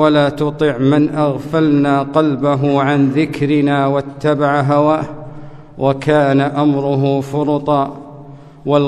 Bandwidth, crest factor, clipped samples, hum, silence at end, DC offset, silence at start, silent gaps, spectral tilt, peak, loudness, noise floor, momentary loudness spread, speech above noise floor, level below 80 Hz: 9.6 kHz; 14 dB; under 0.1%; none; 0 s; under 0.1%; 0 s; none; -8 dB/octave; 0 dBFS; -15 LUFS; -36 dBFS; 6 LU; 22 dB; -48 dBFS